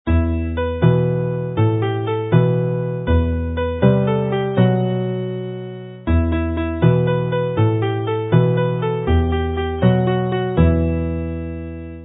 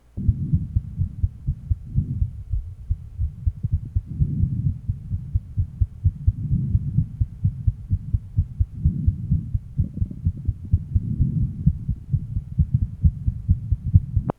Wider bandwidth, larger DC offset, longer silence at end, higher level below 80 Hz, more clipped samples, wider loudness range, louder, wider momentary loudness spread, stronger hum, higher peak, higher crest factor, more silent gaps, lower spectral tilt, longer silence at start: first, 4 kHz vs 1.7 kHz; neither; about the same, 0 s vs 0.1 s; about the same, -26 dBFS vs -28 dBFS; neither; about the same, 1 LU vs 3 LU; first, -19 LUFS vs -25 LUFS; first, 9 LU vs 6 LU; neither; about the same, -2 dBFS vs 0 dBFS; second, 16 dB vs 22 dB; neither; about the same, -13 dB/octave vs -12 dB/octave; about the same, 0.05 s vs 0.15 s